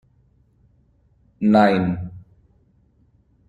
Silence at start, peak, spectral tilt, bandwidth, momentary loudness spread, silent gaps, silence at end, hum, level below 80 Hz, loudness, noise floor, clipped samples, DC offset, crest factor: 1.4 s; -4 dBFS; -8.5 dB/octave; 7.6 kHz; 16 LU; none; 1.3 s; none; -54 dBFS; -18 LUFS; -59 dBFS; under 0.1%; under 0.1%; 20 dB